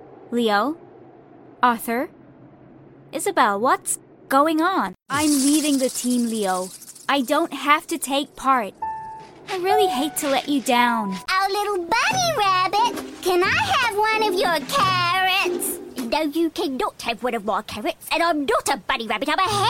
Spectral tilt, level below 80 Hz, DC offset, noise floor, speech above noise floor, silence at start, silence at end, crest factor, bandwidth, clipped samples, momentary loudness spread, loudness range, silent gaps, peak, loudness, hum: -3 dB/octave; -56 dBFS; under 0.1%; -47 dBFS; 26 dB; 0 s; 0 s; 20 dB; 16.5 kHz; under 0.1%; 9 LU; 4 LU; none; -2 dBFS; -21 LUFS; none